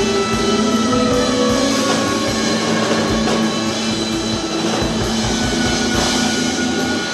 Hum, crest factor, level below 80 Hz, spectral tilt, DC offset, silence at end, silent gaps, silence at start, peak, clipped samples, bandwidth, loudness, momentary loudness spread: none; 14 dB; -36 dBFS; -3.5 dB/octave; under 0.1%; 0 s; none; 0 s; -4 dBFS; under 0.1%; 13.5 kHz; -17 LUFS; 3 LU